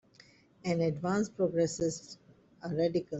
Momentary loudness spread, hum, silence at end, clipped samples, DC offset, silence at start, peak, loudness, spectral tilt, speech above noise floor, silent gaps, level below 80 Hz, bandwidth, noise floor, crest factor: 15 LU; none; 0 s; under 0.1%; under 0.1%; 0.65 s; -18 dBFS; -32 LUFS; -6 dB/octave; 30 dB; none; -66 dBFS; 8.2 kHz; -61 dBFS; 16 dB